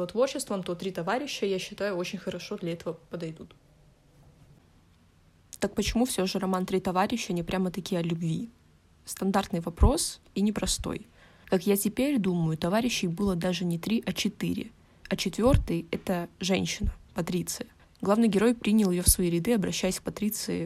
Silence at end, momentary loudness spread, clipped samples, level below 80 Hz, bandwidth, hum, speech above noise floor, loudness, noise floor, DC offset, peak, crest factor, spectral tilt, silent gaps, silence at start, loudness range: 0 s; 11 LU; under 0.1%; -40 dBFS; 15.5 kHz; none; 33 dB; -28 LUFS; -60 dBFS; under 0.1%; -6 dBFS; 22 dB; -5 dB/octave; none; 0 s; 9 LU